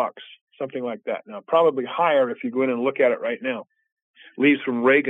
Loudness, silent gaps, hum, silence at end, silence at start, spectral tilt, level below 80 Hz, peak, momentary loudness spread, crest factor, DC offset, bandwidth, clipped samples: -22 LUFS; 0.41-0.47 s, 3.92-4.14 s; none; 0 s; 0 s; -7.5 dB/octave; -82 dBFS; -6 dBFS; 11 LU; 18 dB; under 0.1%; 3.9 kHz; under 0.1%